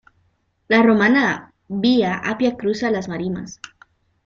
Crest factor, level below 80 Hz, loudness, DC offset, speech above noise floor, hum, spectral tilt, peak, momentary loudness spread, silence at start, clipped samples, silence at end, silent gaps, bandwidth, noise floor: 18 dB; -56 dBFS; -18 LUFS; under 0.1%; 46 dB; none; -5.5 dB/octave; -2 dBFS; 16 LU; 0.7 s; under 0.1%; 0.7 s; none; 7.4 kHz; -65 dBFS